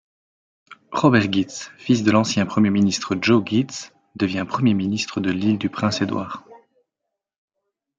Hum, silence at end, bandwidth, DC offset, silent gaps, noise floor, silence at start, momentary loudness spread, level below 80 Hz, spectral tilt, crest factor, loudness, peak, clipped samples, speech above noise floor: none; 1.4 s; 9 kHz; under 0.1%; none; -82 dBFS; 0.7 s; 12 LU; -62 dBFS; -5.5 dB/octave; 20 dB; -20 LUFS; -2 dBFS; under 0.1%; 62 dB